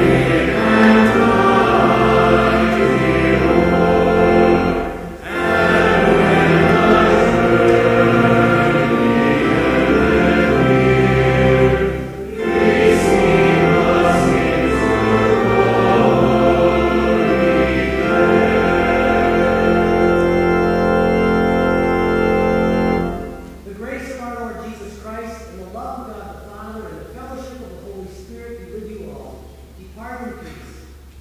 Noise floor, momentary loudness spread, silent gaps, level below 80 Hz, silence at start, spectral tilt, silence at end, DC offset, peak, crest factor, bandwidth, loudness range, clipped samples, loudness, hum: -39 dBFS; 20 LU; none; -32 dBFS; 0 s; -7 dB/octave; 0 s; under 0.1%; 0 dBFS; 14 dB; 15.5 kHz; 19 LU; under 0.1%; -14 LUFS; none